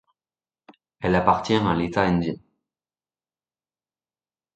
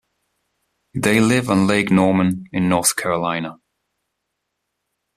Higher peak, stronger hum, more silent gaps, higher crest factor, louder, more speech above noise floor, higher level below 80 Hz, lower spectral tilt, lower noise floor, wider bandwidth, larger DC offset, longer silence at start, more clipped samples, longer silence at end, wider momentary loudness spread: about the same, -2 dBFS vs -2 dBFS; neither; neither; first, 24 dB vs 18 dB; second, -22 LUFS vs -18 LUFS; first, over 69 dB vs 60 dB; first, -48 dBFS vs -54 dBFS; first, -7 dB/octave vs -5 dB/octave; first, under -90 dBFS vs -77 dBFS; second, 8.6 kHz vs 14 kHz; neither; about the same, 1 s vs 0.95 s; neither; first, 2.2 s vs 1.65 s; about the same, 10 LU vs 9 LU